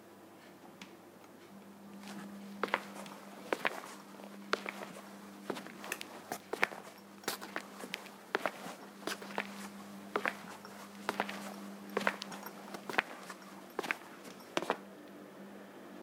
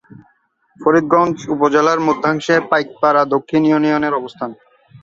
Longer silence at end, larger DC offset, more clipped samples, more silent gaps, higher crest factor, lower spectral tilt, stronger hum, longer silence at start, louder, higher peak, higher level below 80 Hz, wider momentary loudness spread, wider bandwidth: about the same, 0 s vs 0.05 s; neither; neither; neither; first, 36 dB vs 16 dB; second, -3 dB/octave vs -6 dB/octave; neither; second, 0 s vs 0.8 s; second, -41 LUFS vs -15 LUFS; second, -6 dBFS vs 0 dBFS; second, -90 dBFS vs -58 dBFS; first, 17 LU vs 7 LU; first, 17.5 kHz vs 7.6 kHz